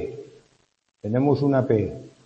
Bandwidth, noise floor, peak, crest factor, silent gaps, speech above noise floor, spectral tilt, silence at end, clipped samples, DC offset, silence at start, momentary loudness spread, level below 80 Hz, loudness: 7.8 kHz; -64 dBFS; -6 dBFS; 18 dB; none; 43 dB; -9.5 dB/octave; 0.2 s; under 0.1%; under 0.1%; 0 s; 16 LU; -56 dBFS; -22 LUFS